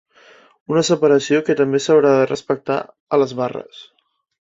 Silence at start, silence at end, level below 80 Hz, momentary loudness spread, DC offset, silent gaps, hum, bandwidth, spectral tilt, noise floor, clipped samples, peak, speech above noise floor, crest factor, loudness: 0.7 s; 0.6 s; -62 dBFS; 10 LU; under 0.1%; 3.00-3.07 s; none; 8 kHz; -5 dB/octave; -49 dBFS; under 0.1%; -2 dBFS; 32 dB; 16 dB; -17 LUFS